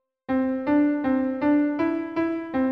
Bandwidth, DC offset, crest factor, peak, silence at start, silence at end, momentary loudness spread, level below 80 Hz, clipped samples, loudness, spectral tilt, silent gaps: 5.2 kHz; under 0.1%; 12 dB; -12 dBFS; 0.3 s; 0 s; 5 LU; -58 dBFS; under 0.1%; -24 LUFS; -8.5 dB/octave; none